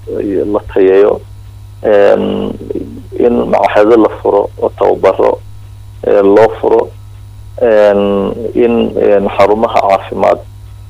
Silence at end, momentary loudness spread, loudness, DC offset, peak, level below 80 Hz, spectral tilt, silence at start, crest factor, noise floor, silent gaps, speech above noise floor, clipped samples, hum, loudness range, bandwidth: 0 s; 11 LU; -10 LUFS; under 0.1%; 0 dBFS; -36 dBFS; -7.5 dB/octave; 0 s; 10 dB; -30 dBFS; none; 21 dB; under 0.1%; none; 1 LU; 11 kHz